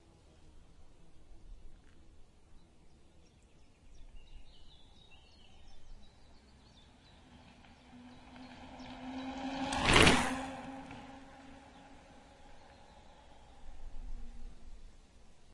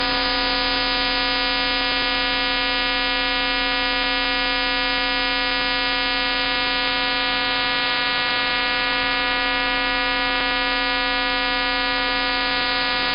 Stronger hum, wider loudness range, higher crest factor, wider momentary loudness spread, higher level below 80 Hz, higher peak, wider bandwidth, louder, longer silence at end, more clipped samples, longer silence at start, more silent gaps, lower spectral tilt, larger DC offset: neither; first, 24 LU vs 0 LU; first, 32 dB vs 14 dB; first, 32 LU vs 1 LU; second, -50 dBFS vs -38 dBFS; about the same, -8 dBFS vs -6 dBFS; first, 11.5 kHz vs 5.6 kHz; second, -31 LUFS vs -19 LUFS; about the same, 0 s vs 0 s; neither; first, 0.4 s vs 0 s; neither; second, -3.5 dB/octave vs -6.5 dB/octave; neither